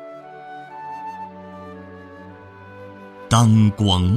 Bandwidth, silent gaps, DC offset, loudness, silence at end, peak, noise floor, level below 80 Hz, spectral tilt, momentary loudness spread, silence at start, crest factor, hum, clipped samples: 14 kHz; none; under 0.1%; -18 LUFS; 0 s; -2 dBFS; -41 dBFS; -46 dBFS; -6 dB/octave; 25 LU; 0 s; 20 dB; none; under 0.1%